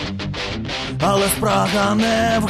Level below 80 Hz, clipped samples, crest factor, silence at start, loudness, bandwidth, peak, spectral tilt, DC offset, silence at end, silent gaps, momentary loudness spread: -38 dBFS; under 0.1%; 14 dB; 0 s; -19 LUFS; 13.5 kHz; -4 dBFS; -4.5 dB/octave; under 0.1%; 0 s; none; 8 LU